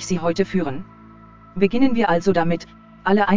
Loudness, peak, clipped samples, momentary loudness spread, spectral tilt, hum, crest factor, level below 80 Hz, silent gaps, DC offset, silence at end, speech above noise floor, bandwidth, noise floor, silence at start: -20 LUFS; -4 dBFS; under 0.1%; 10 LU; -6 dB/octave; none; 16 dB; -48 dBFS; none; under 0.1%; 0 s; 26 dB; 7.6 kHz; -45 dBFS; 0 s